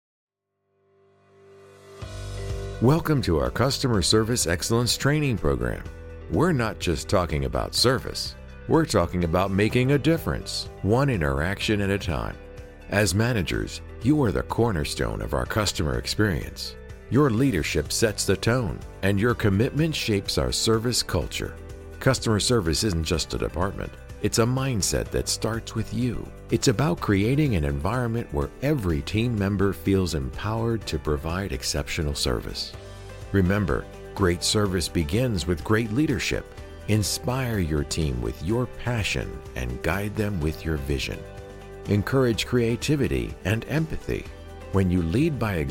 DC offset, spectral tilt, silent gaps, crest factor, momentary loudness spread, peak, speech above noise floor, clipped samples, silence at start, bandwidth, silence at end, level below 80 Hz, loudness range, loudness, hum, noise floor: under 0.1%; -5 dB/octave; none; 18 dB; 11 LU; -8 dBFS; 51 dB; under 0.1%; 1.55 s; 17 kHz; 0 s; -38 dBFS; 4 LU; -25 LUFS; none; -75 dBFS